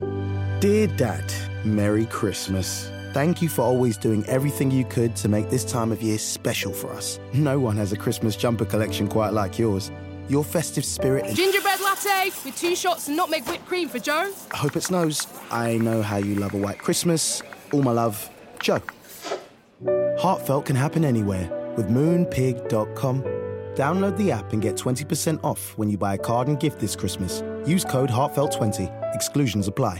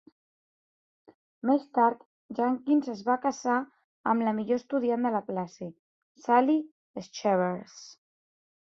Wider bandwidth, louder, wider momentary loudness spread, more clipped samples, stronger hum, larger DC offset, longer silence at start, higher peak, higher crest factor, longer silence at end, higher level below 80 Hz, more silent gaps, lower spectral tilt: first, 17 kHz vs 7.6 kHz; first, -24 LUFS vs -28 LUFS; second, 7 LU vs 18 LU; neither; neither; neither; second, 0 s vs 1.45 s; first, -6 dBFS vs -10 dBFS; about the same, 16 dB vs 20 dB; second, 0 s vs 0.8 s; first, -56 dBFS vs -76 dBFS; second, none vs 2.05-2.29 s, 3.84-4.04 s, 5.79-6.15 s, 6.71-6.94 s; about the same, -5 dB/octave vs -6 dB/octave